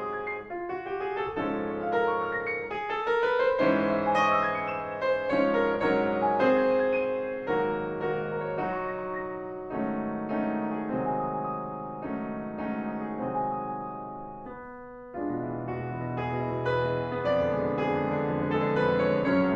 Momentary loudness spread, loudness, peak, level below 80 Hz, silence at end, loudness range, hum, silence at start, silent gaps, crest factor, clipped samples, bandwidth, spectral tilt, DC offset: 11 LU; -29 LUFS; -12 dBFS; -56 dBFS; 0 s; 9 LU; none; 0 s; none; 18 dB; under 0.1%; 7.4 kHz; -7.5 dB/octave; under 0.1%